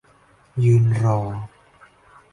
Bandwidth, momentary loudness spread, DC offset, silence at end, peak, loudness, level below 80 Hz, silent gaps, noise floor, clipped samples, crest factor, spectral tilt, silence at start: 10.5 kHz; 17 LU; under 0.1%; 0.85 s; -8 dBFS; -19 LUFS; -50 dBFS; none; -55 dBFS; under 0.1%; 14 dB; -9 dB/octave; 0.55 s